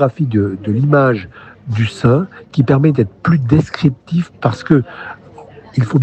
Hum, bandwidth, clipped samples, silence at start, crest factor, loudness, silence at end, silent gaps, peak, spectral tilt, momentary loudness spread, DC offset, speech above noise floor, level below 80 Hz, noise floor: none; 8.6 kHz; under 0.1%; 0 s; 14 dB; -15 LUFS; 0 s; none; 0 dBFS; -8.5 dB/octave; 14 LU; under 0.1%; 24 dB; -46 dBFS; -38 dBFS